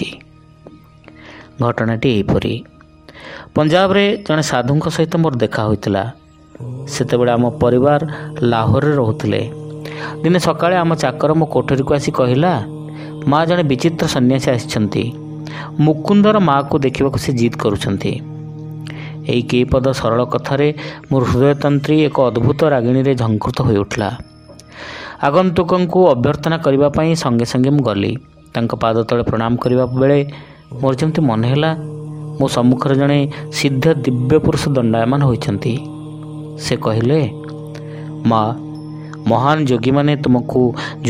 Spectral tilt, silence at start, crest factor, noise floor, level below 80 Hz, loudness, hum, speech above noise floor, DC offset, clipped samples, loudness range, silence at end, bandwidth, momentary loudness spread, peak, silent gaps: -6.5 dB/octave; 0 s; 16 dB; -43 dBFS; -42 dBFS; -16 LUFS; none; 28 dB; under 0.1%; under 0.1%; 3 LU; 0 s; 15.5 kHz; 15 LU; 0 dBFS; none